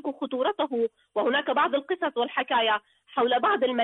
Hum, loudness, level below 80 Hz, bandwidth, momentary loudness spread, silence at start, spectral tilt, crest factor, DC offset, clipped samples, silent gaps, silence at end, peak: none; -26 LUFS; -74 dBFS; 4.1 kHz; 6 LU; 0.05 s; -6 dB/octave; 12 dB; under 0.1%; under 0.1%; none; 0 s; -14 dBFS